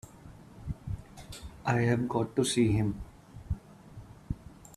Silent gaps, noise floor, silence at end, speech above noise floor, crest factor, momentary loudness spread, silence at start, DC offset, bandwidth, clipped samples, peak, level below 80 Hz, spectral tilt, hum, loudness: none; -51 dBFS; 0 s; 23 dB; 20 dB; 24 LU; 0.05 s; under 0.1%; 13.5 kHz; under 0.1%; -12 dBFS; -48 dBFS; -6 dB/octave; none; -31 LUFS